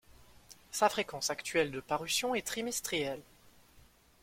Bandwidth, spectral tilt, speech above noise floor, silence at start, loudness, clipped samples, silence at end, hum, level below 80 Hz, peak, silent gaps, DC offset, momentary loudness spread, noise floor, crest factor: 16.5 kHz; -2 dB/octave; 28 dB; 0.1 s; -33 LUFS; under 0.1%; 0.45 s; none; -66 dBFS; -12 dBFS; none; under 0.1%; 7 LU; -62 dBFS; 24 dB